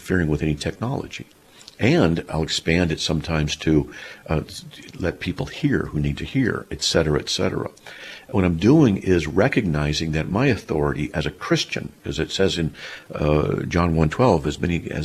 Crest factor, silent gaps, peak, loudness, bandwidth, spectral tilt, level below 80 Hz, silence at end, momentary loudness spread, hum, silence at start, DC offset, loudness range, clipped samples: 18 dB; none; -4 dBFS; -22 LUFS; 14 kHz; -5.5 dB/octave; -38 dBFS; 0 s; 11 LU; none; 0 s; under 0.1%; 4 LU; under 0.1%